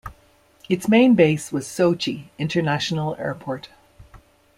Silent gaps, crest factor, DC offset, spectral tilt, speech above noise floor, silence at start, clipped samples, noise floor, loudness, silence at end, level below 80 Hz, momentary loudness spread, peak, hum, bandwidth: none; 20 dB; under 0.1%; -6 dB/octave; 36 dB; 0.05 s; under 0.1%; -56 dBFS; -21 LUFS; 0.4 s; -54 dBFS; 15 LU; -2 dBFS; none; 15.5 kHz